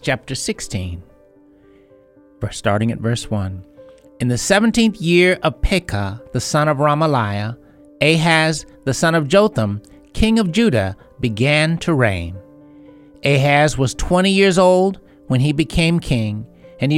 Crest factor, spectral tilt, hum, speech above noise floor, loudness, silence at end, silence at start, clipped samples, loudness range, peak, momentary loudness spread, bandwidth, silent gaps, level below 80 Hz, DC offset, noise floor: 16 dB; -5.5 dB/octave; none; 33 dB; -17 LUFS; 0 s; 0.05 s; under 0.1%; 8 LU; 0 dBFS; 13 LU; 15.5 kHz; none; -34 dBFS; under 0.1%; -49 dBFS